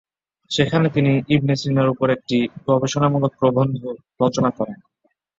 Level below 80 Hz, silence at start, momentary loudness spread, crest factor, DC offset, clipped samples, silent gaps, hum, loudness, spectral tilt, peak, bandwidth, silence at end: -54 dBFS; 0.5 s; 7 LU; 20 dB; under 0.1%; under 0.1%; none; none; -20 LUFS; -6.5 dB/octave; 0 dBFS; 7.8 kHz; 0.65 s